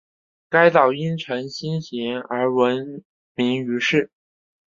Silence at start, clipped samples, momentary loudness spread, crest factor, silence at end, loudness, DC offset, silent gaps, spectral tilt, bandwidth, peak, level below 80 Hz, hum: 0.5 s; under 0.1%; 14 LU; 20 dB; 0.6 s; -21 LUFS; under 0.1%; 3.05-3.35 s; -6 dB/octave; 7.4 kHz; -2 dBFS; -66 dBFS; none